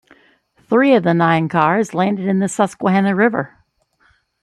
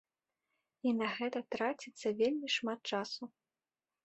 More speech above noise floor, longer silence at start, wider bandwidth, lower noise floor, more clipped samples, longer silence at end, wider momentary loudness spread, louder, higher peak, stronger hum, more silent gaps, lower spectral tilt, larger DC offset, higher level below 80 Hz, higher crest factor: second, 44 dB vs over 54 dB; second, 0.7 s vs 0.85 s; first, 11.5 kHz vs 8.2 kHz; second, -59 dBFS vs under -90 dBFS; neither; first, 0.95 s vs 0.75 s; about the same, 5 LU vs 7 LU; first, -16 LUFS vs -37 LUFS; first, -2 dBFS vs -20 dBFS; neither; neither; first, -6.5 dB/octave vs -4 dB/octave; neither; first, -62 dBFS vs -82 dBFS; about the same, 16 dB vs 18 dB